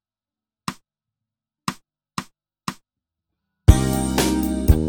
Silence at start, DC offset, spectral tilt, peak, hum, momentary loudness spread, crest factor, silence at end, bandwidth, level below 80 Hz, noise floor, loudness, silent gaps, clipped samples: 0.7 s; under 0.1%; -5.5 dB/octave; 0 dBFS; none; 17 LU; 22 dB; 0 s; 19 kHz; -26 dBFS; under -90 dBFS; -20 LUFS; none; under 0.1%